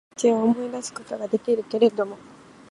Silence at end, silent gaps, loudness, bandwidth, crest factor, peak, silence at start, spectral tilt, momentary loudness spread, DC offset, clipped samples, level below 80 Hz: 0.55 s; none; -24 LUFS; 11.5 kHz; 18 dB; -6 dBFS; 0.2 s; -5 dB/octave; 12 LU; under 0.1%; under 0.1%; -70 dBFS